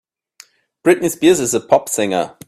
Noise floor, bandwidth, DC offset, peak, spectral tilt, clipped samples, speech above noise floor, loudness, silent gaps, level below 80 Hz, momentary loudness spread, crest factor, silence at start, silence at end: -48 dBFS; 15.5 kHz; under 0.1%; 0 dBFS; -4 dB/octave; under 0.1%; 32 dB; -15 LUFS; none; -56 dBFS; 5 LU; 16 dB; 0.85 s; 0.2 s